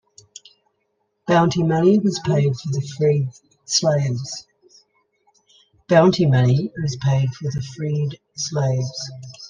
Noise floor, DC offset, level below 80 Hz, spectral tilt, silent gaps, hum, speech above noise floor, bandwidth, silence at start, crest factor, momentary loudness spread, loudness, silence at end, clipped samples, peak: -71 dBFS; under 0.1%; -54 dBFS; -6 dB/octave; none; none; 52 dB; 9.6 kHz; 1.25 s; 18 dB; 12 LU; -20 LUFS; 0 s; under 0.1%; -2 dBFS